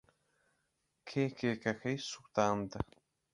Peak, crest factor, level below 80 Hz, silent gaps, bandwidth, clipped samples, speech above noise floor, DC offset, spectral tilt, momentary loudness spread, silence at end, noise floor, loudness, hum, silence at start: -14 dBFS; 24 dB; -60 dBFS; none; 11.5 kHz; under 0.1%; 46 dB; under 0.1%; -5.5 dB/octave; 10 LU; 0.5 s; -81 dBFS; -37 LUFS; none; 1.05 s